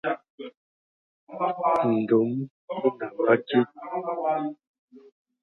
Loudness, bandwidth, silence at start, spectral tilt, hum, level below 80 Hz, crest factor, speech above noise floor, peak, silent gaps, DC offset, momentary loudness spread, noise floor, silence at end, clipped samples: -26 LUFS; 5.6 kHz; 0.05 s; -8.5 dB/octave; none; -74 dBFS; 20 dB; over 65 dB; -6 dBFS; 0.30-0.38 s, 0.57-1.27 s, 2.51-2.68 s, 4.67-4.88 s; under 0.1%; 14 LU; under -90 dBFS; 0.45 s; under 0.1%